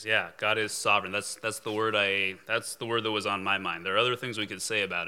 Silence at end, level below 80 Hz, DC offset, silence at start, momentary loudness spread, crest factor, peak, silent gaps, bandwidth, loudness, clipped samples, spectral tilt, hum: 0 s; -82 dBFS; under 0.1%; 0 s; 7 LU; 20 dB; -10 dBFS; none; 17 kHz; -28 LUFS; under 0.1%; -2.5 dB/octave; none